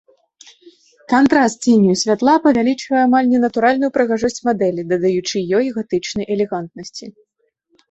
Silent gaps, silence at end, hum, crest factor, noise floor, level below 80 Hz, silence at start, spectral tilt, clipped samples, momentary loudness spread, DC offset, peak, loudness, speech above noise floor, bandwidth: none; 0.8 s; none; 16 dB; -63 dBFS; -56 dBFS; 1.1 s; -5 dB/octave; under 0.1%; 8 LU; under 0.1%; -2 dBFS; -16 LUFS; 47 dB; 8.2 kHz